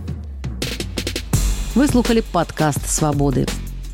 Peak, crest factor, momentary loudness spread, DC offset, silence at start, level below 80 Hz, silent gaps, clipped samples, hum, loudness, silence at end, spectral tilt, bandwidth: -4 dBFS; 16 dB; 11 LU; under 0.1%; 0 s; -26 dBFS; none; under 0.1%; none; -20 LUFS; 0 s; -5 dB/octave; 17 kHz